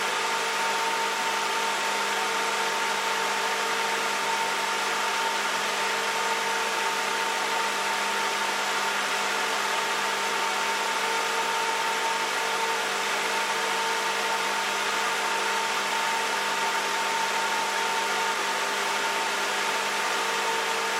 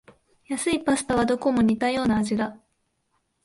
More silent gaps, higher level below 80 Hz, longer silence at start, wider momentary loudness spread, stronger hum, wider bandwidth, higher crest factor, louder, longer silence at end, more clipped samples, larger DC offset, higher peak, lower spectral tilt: neither; second, -74 dBFS vs -52 dBFS; second, 0 s vs 0.5 s; second, 0 LU vs 7 LU; first, 50 Hz at -75 dBFS vs none; first, 16.5 kHz vs 11.5 kHz; about the same, 14 dB vs 16 dB; about the same, -25 LUFS vs -24 LUFS; second, 0 s vs 0.9 s; neither; neither; second, -14 dBFS vs -10 dBFS; second, 0 dB/octave vs -5 dB/octave